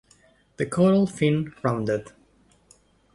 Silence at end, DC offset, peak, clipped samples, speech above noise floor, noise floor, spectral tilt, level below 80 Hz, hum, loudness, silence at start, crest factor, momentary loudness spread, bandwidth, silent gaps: 1.1 s; under 0.1%; -8 dBFS; under 0.1%; 37 dB; -60 dBFS; -7 dB/octave; -58 dBFS; none; -24 LUFS; 0.6 s; 18 dB; 9 LU; 11.5 kHz; none